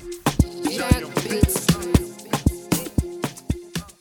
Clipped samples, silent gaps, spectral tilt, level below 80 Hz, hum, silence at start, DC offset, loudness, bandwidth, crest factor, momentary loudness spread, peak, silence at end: under 0.1%; none; -5 dB/octave; -30 dBFS; none; 0 s; under 0.1%; -23 LUFS; 19.5 kHz; 22 dB; 10 LU; -2 dBFS; 0.1 s